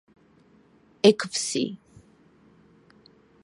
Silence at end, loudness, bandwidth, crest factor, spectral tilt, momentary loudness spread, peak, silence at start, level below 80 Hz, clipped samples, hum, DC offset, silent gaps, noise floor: 1.65 s; -23 LUFS; 11.5 kHz; 26 dB; -3.5 dB/octave; 13 LU; -2 dBFS; 1.05 s; -72 dBFS; under 0.1%; none; under 0.1%; none; -58 dBFS